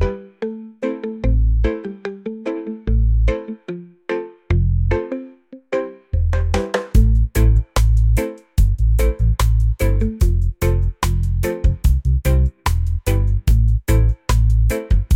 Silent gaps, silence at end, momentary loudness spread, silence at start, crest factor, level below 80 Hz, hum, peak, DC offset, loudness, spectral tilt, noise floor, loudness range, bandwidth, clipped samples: none; 0 s; 11 LU; 0 s; 14 dB; -18 dBFS; none; -4 dBFS; under 0.1%; -19 LUFS; -7 dB/octave; -40 dBFS; 5 LU; 16 kHz; under 0.1%